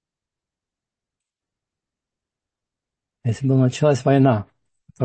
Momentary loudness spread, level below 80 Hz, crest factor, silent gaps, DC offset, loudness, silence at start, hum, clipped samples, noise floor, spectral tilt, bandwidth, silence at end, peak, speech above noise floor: 10 LU; -64 dBFS; 20 dB; none; under 0.1%; -19 LUFS; 3.25 s; none; under 0.1%; -88 dBFS; -7.5 dB/octave; 8.6 kHz; 0 s; -4 dBFS; 71 dB